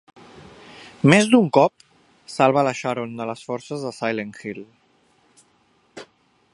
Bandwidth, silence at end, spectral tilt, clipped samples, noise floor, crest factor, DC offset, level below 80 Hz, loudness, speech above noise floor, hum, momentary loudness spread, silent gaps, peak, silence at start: 11.5 kHz; 0.5 s; -5.5 dB/octave; under 0.1%; -61 dBFS; 22 dB; under 0.1%; -64 dBFS; -20 LUFS; 42 dB; none; 27 LU; none; 0 dBFS; 0.8 s